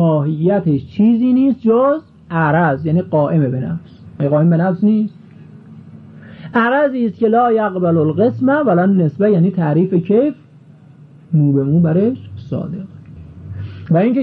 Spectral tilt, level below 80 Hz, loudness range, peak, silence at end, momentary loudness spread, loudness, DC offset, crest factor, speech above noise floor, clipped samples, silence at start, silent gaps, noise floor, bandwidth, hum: -11.5 dB/octave; -54 dBFS; 4 LU; -2 dBFS; 0 s; 13 LU; -15 LUFS; under 0.1%; 12 dB; 29 dB; under 0.1%; 0 s; none; -42 dBFS; 4.4 kHz; none